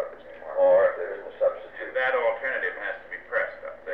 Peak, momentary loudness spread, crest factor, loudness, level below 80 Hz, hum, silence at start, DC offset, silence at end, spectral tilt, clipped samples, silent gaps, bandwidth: -12 dBFS; 16 LU; 14 dB; -26 LUFS; -64 dBFS; none; 0 s; 0.2%; 0 s; -5.5 dB/octave; under 0.1%; none; 4.3 kHz